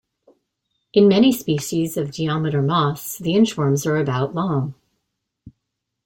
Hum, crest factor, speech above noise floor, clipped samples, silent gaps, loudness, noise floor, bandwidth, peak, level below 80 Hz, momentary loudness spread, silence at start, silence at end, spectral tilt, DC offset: none; 16 dB; 60 dB; under 0.1%; none; -19 LUFS; -79 dBFS; 17 kHz; -4 dBFS; -58 dBFS; 9 LU; 0.95 s; 0.55 s; -6 dB/octave; under 0.1%